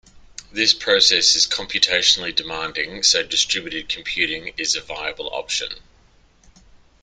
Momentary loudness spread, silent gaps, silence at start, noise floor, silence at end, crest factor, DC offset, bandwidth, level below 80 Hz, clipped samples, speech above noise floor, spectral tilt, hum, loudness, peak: 13 LU; none; 0.4 s; -54 dBFS; 1.2 s; 22 dB; under 0.1%; 13 kHz; -52 dBFS; under 0.1%; 33 dB; 0.5 dB/octave; none; -18 LUFS; 0 dBFS